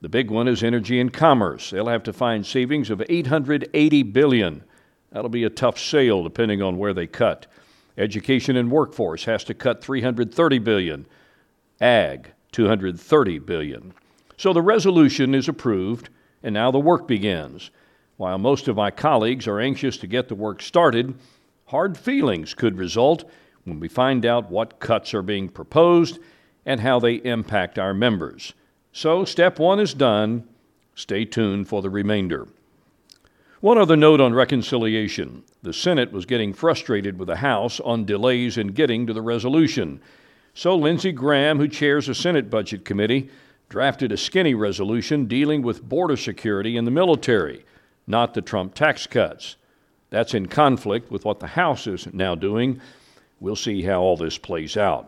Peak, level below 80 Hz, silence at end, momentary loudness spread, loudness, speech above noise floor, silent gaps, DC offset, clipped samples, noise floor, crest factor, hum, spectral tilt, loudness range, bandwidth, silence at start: 0 dBFS; -56 dBFS; 0 s; 11 LU; -21 LUFS; 42 dB; none; under 0.1%; under 0.1%; -62 dBFS; 20 dB; none; -6 dB/octave; 4 LU; 12 kHz; 0 s